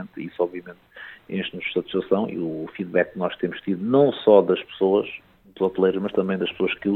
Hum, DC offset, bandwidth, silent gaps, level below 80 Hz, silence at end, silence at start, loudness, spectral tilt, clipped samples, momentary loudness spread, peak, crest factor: none; under 0.1%; 4.3 kHz; none; -62 dBFS; 0 s; 0 s; -23 LUFS; -9 dB/octave; under 0.1%; 17 LU; -4 dBFS; 20 dB